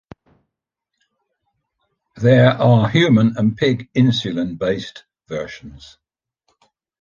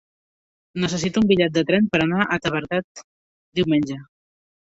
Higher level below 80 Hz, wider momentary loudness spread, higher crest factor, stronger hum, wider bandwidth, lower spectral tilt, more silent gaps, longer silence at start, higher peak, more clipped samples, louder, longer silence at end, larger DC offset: about the same, -52 dBFS vs -54 dBFS; first, 16 LU vs 11 LU; about the same, 18 dB vs 20 dB; neither; second, 7.2 kHz vs 8 kHz; first, -7.5 dB/octave vs -5.5 dB/octave; second, none vs 2.84-2.95 s, 3.04-3.52 s; first, 2.15 s vs 0.75 s; about the same, -2 dBFS vs -4 dBFS; neither; first, -16 LUFS vs -21 LUFS; first, 1.25 s vs 0.65 s; neither